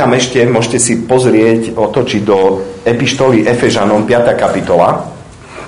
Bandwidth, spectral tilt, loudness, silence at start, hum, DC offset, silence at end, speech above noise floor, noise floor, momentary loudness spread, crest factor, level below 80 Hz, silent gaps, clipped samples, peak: 11 kHz; -5 dB/octave; -11 LUFS; 0 s; none; 0.2%; 0 s; 20 dB; -30 dBFS; 4 LU; 10 dB; -42 dBFS; none; 0.5%; 0 dBFS